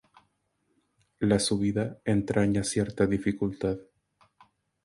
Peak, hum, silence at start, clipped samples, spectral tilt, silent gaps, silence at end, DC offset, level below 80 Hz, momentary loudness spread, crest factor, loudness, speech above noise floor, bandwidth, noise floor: -10 dBFS; none; 1.2 s; under 0.1%; -5.5 dB/octave; none; 1 s; under 0.1%; -52 dBFS; 6 LU; 20 dB; -28 LUFS; 48 dB; 11.5 kHz; -75 dBFS